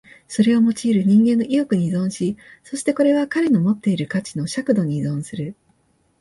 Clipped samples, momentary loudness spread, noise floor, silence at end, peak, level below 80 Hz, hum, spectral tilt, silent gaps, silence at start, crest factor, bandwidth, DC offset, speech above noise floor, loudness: under 0.1%; 12 LU; -62 dBFS; 0.7 s; -4 dBFS; -60 dBFS; none; -6.5 dB/octave; none; 0.3 s; 16 dB; 11.5 kHz; under 0.1%; 44 dB; -19 LUFS